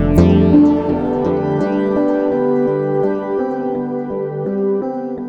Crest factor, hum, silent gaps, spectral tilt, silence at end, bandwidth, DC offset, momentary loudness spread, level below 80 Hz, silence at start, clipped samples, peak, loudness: 14 dB; none; none; -9.5 dB/octave; 0 s; 7.6 kHz; under 0.1%; 10 LU; -32 dBFS; 0 s; under 0.1%; 0 dBFS; -16 LUFS